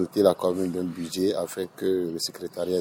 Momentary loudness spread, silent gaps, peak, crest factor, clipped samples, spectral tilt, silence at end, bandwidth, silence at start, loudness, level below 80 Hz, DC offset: 9 LU; none; -6 dBFS; 20 dB; under 0.1%; -5 dB/octave; 0 s; 17 kHz; 0 s; -27 LUFS; -66 dBFS; under 0.1%